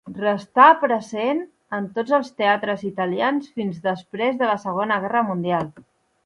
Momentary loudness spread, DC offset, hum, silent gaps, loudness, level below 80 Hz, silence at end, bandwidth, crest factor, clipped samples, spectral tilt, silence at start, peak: 13 LU; under 0.1%; none; none; -21 LUFS; -66 dBFS; 0.45 s; 11 kHz; 20 dB; under 0.1%; -6.5 dB/octave; 0.05 s; -2 dBFS